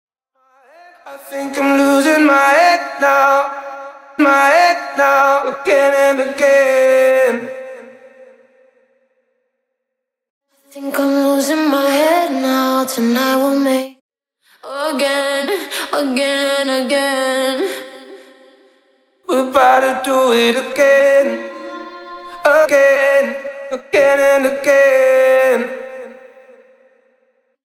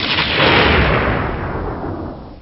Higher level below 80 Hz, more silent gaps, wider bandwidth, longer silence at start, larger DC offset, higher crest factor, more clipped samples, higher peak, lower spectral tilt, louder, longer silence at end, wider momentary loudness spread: second, -64 dBFS vs -28 dBFS; first, 10.30-10.41 s, 14.01-14.09 s vs none; first, 16 kHz vs 6 kHz; first, 1.05 s vs 0 s; second, under 0.1% vs 0.2%; about the same, 14 dB vs 16 dB; neither; about the same, 0 dBFS vs 0 dBFS; about the same, -2.5 dB/octave vs -2.5 dB/octave; about the same, -13 LUFS vs -15 LUFS; first, 1.5 s vs 0 s; first, 18 LU vs 15 LU